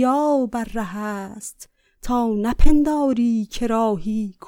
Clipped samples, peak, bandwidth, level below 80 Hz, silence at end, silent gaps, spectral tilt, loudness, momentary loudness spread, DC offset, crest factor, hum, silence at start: under 0.1%; -2 dBFS; 13.5 kHz; -26 dBFS; 0.15 s; none; -6 dB/octave; -21 LUFS; 13 LU; under 0.1%; 16 dB; none; 0 s